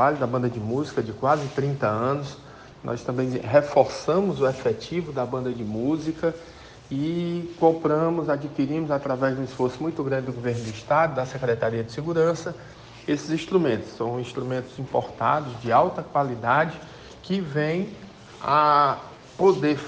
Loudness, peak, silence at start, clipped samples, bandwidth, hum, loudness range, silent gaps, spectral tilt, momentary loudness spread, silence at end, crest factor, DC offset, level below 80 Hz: -25 LUFS; -4 dBFS; 0 s; under 0.1%; 9.2 kHz; none; 3 LU; none; -7 dB/octave; 12 LU; 0 s; 20 dB; under 0.1%; -56 dBFS